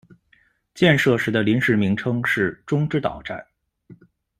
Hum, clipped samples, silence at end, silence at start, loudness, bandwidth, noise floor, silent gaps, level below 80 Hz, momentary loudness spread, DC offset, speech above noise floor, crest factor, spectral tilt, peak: none; under 0.1%; 0.45 s; 0.75 s; -20 LUFS; 15 kHz; -61 dBFS; none; -54 dBFS; 12 LU; under 0.1%; 41 dB; 20 dB; -6.5 dB/octave; -2 dBFS